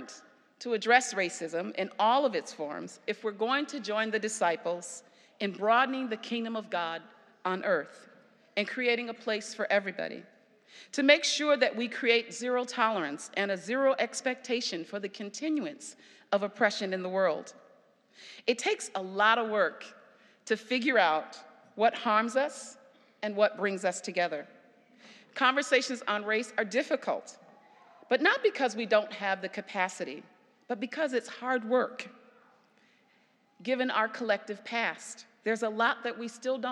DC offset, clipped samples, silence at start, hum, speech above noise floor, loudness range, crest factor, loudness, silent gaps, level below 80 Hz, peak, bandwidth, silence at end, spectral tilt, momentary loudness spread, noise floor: under 0.1%; under 0.1%; 0 s; none; 37 dB; 5 LU; 26 dB; -30 LUFS; none; under -90 dBFS; -6 dBFS; 12 kHz; 0 s; -3 dB/octave; 14 LU; -67 dBFS